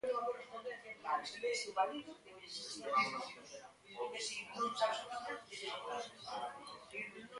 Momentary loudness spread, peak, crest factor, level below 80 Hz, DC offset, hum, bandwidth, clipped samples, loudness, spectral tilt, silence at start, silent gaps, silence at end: 13 LU; -22 dBFS; 20 dB; -82 dBFS; under 0.1%; none; 11.5 kHz; under 0.1%; -41 LUFS; -1.5 dB/octave; 0.05 s; none; 0 s